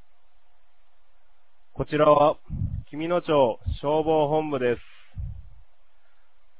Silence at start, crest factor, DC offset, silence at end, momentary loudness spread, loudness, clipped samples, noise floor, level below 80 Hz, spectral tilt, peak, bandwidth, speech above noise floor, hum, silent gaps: 1.75 s; 20 dB; 0.8%; 1.2 s; 19 LU; -24 LUFS; under 0.1%; -65 dBFS; -42 dBFS; -10.5 dB/octave; -6 dBFS; 4 kHz; 42 dB; none; none